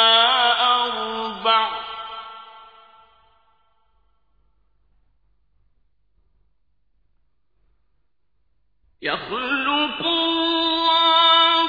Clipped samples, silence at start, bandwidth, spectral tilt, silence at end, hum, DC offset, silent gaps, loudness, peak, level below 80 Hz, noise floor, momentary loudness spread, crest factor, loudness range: under 0.1%; 0 s; 5 kHz; -3.5 dB/octave; 0 s; none; under 0.1%; none; -18 LUFS; -4 dBFS; -60 dBFS; -72 dBFS; 17 LU; 20 dB; 19 LU